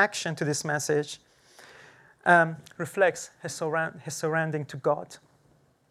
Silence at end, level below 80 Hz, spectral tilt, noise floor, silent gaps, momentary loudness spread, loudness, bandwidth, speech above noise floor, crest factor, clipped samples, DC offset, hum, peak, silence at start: 0.75 s; -74 dBFS; -4 dB/octave; -64 dBFS; none; 15 LU; -27 LUFS; 15 kHz; 37 dB; 22 dB; under 0.1%; under 0.1%; none; -6 dBFS; 0 s